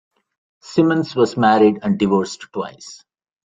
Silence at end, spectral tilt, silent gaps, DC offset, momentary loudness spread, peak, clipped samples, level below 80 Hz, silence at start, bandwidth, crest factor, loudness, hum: 0.5 s; -6.5 dB/octave; none; under 0.1%; 16 LU; -2 dBFS; under 0.1%; -58 dBFS; 0.65 s; 9.2 kHz; 16 dB; -17 LUFS; none